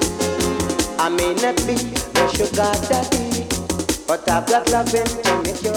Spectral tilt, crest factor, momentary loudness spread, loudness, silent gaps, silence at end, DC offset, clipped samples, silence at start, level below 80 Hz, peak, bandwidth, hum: -3.5 dB/octave; 16 dB; 4 LU; -19 LUFS; none; 0 s; under 0.1%; under 0.1%; 0 s; -36 dBFS; -2 dBFS; over 20 kHz; none